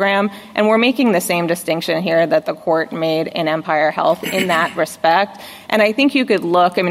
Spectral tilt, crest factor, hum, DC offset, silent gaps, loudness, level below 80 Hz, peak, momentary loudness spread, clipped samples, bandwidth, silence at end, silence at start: -4.5 dB/octave; 16 dB; none; under 0.1%; none; -16 LUFS; -64 dBFS; 0 dBFS; 6 LU; under 0.1%; 16 kHz; 0 s; 0 s